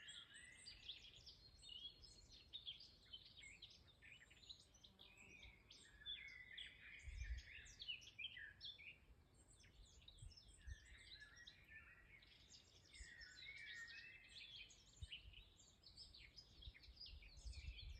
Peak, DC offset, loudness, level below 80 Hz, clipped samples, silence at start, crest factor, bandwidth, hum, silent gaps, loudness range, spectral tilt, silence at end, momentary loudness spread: -42 dBFS; under 0.1%; -59 LUFS; -66 dBFS; under 0.1%; 0 s; 20 dB; 9 kHz; none; none; 7 LU; -2 dB/octave; 0 s; 12 LU